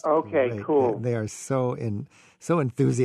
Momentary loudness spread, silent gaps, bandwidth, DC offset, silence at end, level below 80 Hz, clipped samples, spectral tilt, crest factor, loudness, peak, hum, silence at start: 11 LU; none; 12.5 kHz; under 0.1%; 0 s; -64 dBFS; under 0.1%; -7 dB/octave; 14 dB; -25 LUFS; -10 dBFS; none; 0.05 s